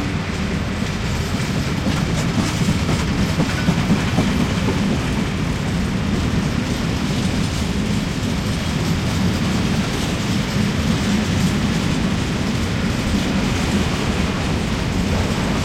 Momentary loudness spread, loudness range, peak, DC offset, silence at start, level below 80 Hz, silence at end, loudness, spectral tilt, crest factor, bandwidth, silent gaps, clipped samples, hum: 3 LU; 2 LU; -6 dBFS; under 0.1%; 0 s; -30 dBFS; 0 s; -20 LUFS; -5.5 dB/octave; 14 dB; 16.5 kHz; none; under 0.1%; none